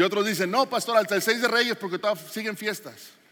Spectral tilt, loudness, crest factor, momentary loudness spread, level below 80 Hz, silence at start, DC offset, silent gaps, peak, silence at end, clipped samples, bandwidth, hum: -3 dB/octave; -25 LUFS; 18 dB; 9 LU; -86 dBFS; 0 s; under 0.1%; none; -8 dBFS; 0.25 s; under 0.1%; 17 kHz; none